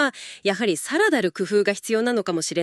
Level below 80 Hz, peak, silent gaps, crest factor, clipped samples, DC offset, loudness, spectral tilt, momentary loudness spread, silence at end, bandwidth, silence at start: -74 dBFS; -6 dBFS; none; 16 dB; under 0.1%; under 0.1%; -22 LUFS; -3.5 dB/octave; 5 LU; 0 s; 13 kHz; 0 s